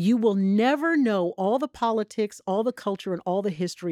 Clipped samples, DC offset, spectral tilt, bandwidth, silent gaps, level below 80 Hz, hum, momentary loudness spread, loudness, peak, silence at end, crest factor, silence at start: under 0.1%; under 0.1%; -6.5 dB/octave; 13.5 kHz; none; -68 dBFS; none; 8 LU; -25 LUFS; -10 dBFS; 0 s; 14 dB; 0 s